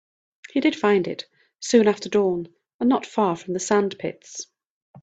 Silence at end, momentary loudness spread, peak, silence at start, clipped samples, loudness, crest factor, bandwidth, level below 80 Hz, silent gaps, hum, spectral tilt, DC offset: 0.05 s; 17 LU; -6 dBFS; 0.55 s; under 0.1%; -22 LUFS; 18 dB; 9 kHz; -66 dBFS; 2.74-2.79 s, 4.70-4.94 s; none; -4.5 dB/octave; under 0.1%